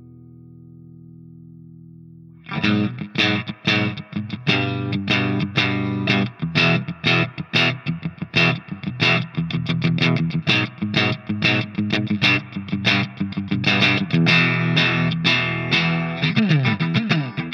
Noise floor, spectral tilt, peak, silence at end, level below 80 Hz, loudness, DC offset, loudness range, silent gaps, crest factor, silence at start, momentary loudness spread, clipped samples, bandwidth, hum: -43 dBFS; -6 dB/octave; -4 dBFS; 0 s; -58 dBFS; -19 LUFS; under 0.1%; 5 LU; none; 18 dB; 0 s; 8 LU; under 0.1%; 7.2 kHz; none